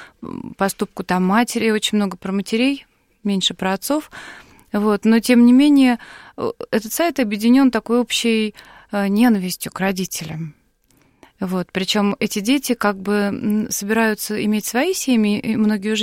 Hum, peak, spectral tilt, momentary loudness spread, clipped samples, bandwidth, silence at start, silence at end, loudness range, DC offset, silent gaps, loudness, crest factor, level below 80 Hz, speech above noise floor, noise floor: none; -4 dBFS; -4.5 dB/octave; 13 LU; under 0.1%; 16.5 kHz; 0 s; 0 s; 6 LU; under 0.1%; none; -18 LUFS; 16 dB; -56 dBFS; 40 dB; -58 dBFS